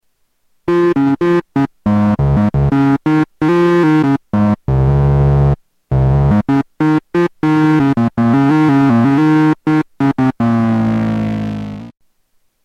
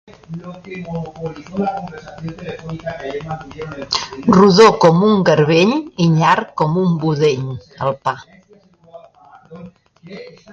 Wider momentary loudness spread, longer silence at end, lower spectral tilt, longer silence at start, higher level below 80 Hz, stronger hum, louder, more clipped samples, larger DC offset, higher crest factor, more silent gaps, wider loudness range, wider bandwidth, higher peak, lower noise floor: second, 6 LU vs 21 LU; first, 0.75 s vs 0.2 s; first, -9 dB/octave vs -6.5 dB/octave; first, 0.65 s vs 0.3 s; first, -28 dBFS vs -50 dBFS; neither; about the same, -13 LUFS vs -15 LUFS; neither; neither; about the same, 12 dB vs 16 dB; neither; second, 2 LU vs 14 LU; about the same, 7.8 kHz vs 8 kHz; about the same, -2 dBFS vs 0 dBFS; first, -60 dBFS vs -49 dBFS